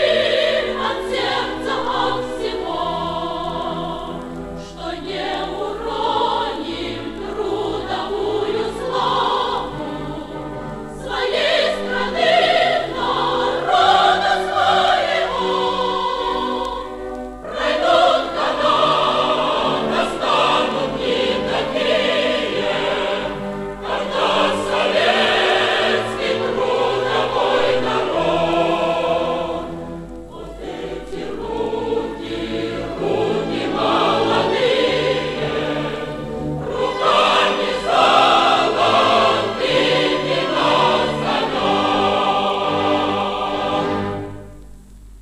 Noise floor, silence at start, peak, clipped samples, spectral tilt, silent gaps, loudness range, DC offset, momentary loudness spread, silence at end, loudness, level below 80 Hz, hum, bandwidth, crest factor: -39 dBFS; 0 s; -2 dBFS; under 0.1%; -4.5 dB/octave; none; 8 LU; under 0.1%; 12 LU; 0 s; -18 LUFS; -44 dBFS; none; 13.5 kHz; 16 dB